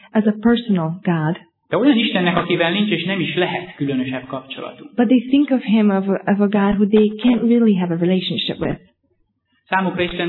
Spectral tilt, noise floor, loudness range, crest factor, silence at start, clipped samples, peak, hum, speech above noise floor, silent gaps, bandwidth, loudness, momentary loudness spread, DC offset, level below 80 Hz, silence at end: -10 dB/octave; -65 dBFS; 3 LU; 16 dB; 0.15 s; under 0.1%; -2 dBFS; none; 48 dB; none; 4.3 kHz; -18 LUFS; 10 LU; under 0.1%; -50 dBFS; 0 s